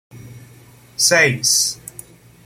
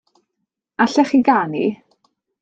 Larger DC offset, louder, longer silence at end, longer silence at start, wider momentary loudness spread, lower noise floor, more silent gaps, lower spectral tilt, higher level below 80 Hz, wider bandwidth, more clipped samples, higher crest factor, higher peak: neither; first, -14 LUFS vs -17 LUFS; about the same, 0.7 s vs 0.65 s; second, 0.15 s vs 0.8 s; first, 21 LU vs 17 LU; second, -45 dBFS vs -77 dBFS; neither; second, -1.5 dB/octave vs -5.5 dB/octave; first, -58 dBFS vs -66 dBFS; first, 16.5 kHz vs 8 kHz; neither; about the same, 20 dB vs 18 dB; about the same, -2 dBFS vs -2 dBFS